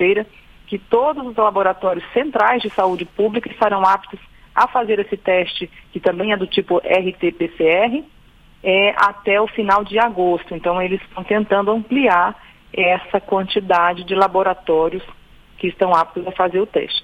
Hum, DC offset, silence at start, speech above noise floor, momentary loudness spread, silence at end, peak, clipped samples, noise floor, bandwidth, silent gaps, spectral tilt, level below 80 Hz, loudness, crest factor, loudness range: none; under 0.1%; 0 s; 30 dB; 8 LU; 0.05 s; 0 dBFS; under 0.1%; -48 dBFS; 9.2 kHz; none; -6.5 dB/octave; -50 dBFS; -18 LUFS; 18 dB; 2 LU